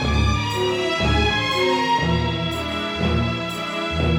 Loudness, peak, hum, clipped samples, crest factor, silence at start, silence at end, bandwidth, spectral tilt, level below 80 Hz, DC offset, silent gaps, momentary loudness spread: -21 LUFS; -8 dBFS; none; under 0.1%; 14 dB; 0 s; 0 s; 16.5 kHz; -5.5 dB/octave; -30 dBFS; under 0.1%; none; 6 LU